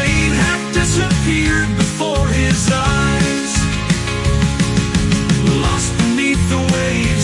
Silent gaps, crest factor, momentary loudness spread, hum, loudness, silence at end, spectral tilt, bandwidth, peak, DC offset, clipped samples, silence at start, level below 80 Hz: none; 12 dB; 3 LU; none; -15 LUFS; 0 s; -4.5 dB/octave; 11.5 kHz; -2 dBFS; under 0.1%; under 0.1%; 0 s; -24 dBFS